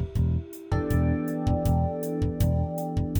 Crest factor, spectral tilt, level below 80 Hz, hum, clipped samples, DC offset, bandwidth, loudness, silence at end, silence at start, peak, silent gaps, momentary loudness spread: 14 dB; -8 dB/octave; -34 dBFS; none; under 0.1%; under 0.1%; over 20 kHz; -27 LUFS; 0 s; 0 s; -12 dBFS; none; 5 LU